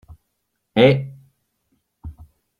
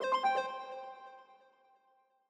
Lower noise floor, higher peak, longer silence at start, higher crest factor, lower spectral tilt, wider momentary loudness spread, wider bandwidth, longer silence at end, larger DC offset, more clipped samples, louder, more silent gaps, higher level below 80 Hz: about the same, -74 dBFS vs -72 dBFS; first, -2 dBFS vs -20 dBFS; first, 0.75 s vs 0 s; about the same, 22 dB vs 18 dB; first, -8 dB/octave vs -2 dB/octave; first, 26 LU vs 23 LU; about the same, 9.8 kHz vs 10 kHz; second, 0.5 s vs 0.95 s; neither; neither; first, -17 LUFS vs -36 LUFS; neither; first, -50 dBFS vs under -90 dBFS